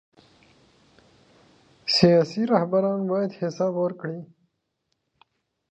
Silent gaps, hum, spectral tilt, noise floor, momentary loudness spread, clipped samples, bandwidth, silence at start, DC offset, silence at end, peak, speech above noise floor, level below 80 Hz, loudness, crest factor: none; none; -6 dB/octave; -77 dBFS; 16 LU; under 0.1%; 8.4 kHz; 1.85 s; under 0.1%; 1.45 s; -4 dBFS; 54 dB; -64 dBFS; -23 LUFS; 22 dB